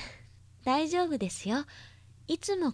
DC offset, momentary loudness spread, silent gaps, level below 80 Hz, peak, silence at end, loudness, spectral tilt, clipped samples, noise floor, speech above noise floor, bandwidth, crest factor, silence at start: under 0.1%; 17 LU; none; -62 dBFS; -14 dBFS; 0 s; -31 LUFS; -4.5 dB/octave; under 0.1%; -55 dBFS; 24 dB; 11 kHz; 18 dB; 0 s